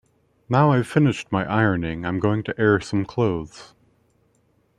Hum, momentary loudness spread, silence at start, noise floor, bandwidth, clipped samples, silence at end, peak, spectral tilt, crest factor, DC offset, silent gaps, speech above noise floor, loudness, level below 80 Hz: none; 7 LU; 0.5 s; -64 dBFS; 11.5 kHz; under 0.1%; 1.15 s; -2 dBFS; -7.5 dB/octave; 20 dB; under 0.1%; none; 43 dB; -21 LUFS; -52 dBFS